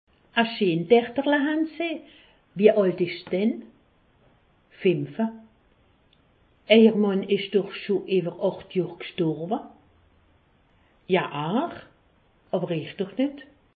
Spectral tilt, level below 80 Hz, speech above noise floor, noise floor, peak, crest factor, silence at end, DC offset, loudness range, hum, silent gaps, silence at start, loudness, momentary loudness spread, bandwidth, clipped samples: -10.5 dB/octave; -68 dBFS; 38 dB; -62 dBFS; -4 dBFS; 22 dB; 0.35 s; under 0.1%; 7 LU; none; none; 0.35 s; -24 LUFS; 12 LU; 4.8 kHz; under 0.1%